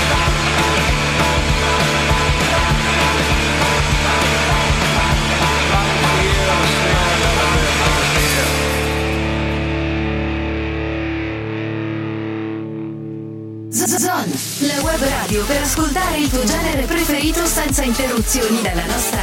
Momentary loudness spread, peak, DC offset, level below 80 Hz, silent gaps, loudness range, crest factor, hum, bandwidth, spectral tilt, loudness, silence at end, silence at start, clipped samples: 8 LU; -4 dBFS; under 0.1%; -24 dBFS; none; 7 LU; 12 dB; none; 16.5 kHz; -3.5 dB/octave; -16 LUFS; 0 s; 0 s; under 0.1%